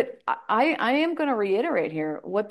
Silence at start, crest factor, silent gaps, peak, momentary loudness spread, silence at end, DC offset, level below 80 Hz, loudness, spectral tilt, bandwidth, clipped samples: 0 s; 16 dB; none; -10 dBFS; 7 LU; 0 s; under 0.1%; -76 dBFS; -25 LUFS; -6.5 dB/octave; 12 kHz; under 0.1%